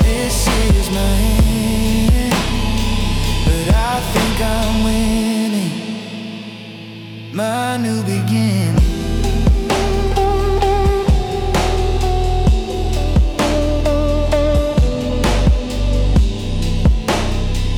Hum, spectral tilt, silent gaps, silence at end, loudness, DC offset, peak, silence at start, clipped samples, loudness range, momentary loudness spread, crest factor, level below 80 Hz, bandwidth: none; -5.5 dB/octave; none; 0 s; -17 LUFS; under 0.1%; -4 dBFS; 0 s; under 0.1%; 4 LU; 6 LU; 10 dB; -18 dBFS; 18.5 kHz